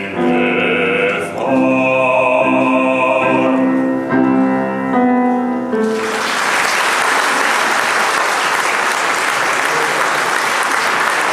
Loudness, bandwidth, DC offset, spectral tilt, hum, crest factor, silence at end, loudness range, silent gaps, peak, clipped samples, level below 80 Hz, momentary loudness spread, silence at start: -14 LUFS; 15.5 kHz; under 0.1%; -3.5 dB/octave; none; 14 dB; 0 s; 1 LU; none; 0 dBFS; under 0.1%; -60 dBFS; 4 LU; 0 s